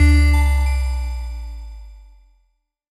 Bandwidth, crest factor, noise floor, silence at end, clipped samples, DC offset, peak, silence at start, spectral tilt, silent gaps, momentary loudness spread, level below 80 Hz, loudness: 12.5 kHz; 16 dB; -66 dBFS; 1 s; under 0.1%; under 0.1%; -4 dBFS; 0 s; -6 dB/octave; none; 23 LU; -20 dBFS; -19 LUFS